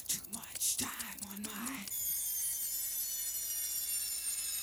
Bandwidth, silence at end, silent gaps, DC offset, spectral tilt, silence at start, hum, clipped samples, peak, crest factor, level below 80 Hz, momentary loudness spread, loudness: over 20 kHz; 0 s; none; under 0.1%; 0 dB/octave; 0 s; none; under 0.1%; -24 dBFS; 14 dB; -68 dBFS; 8 LU; -35 LUFS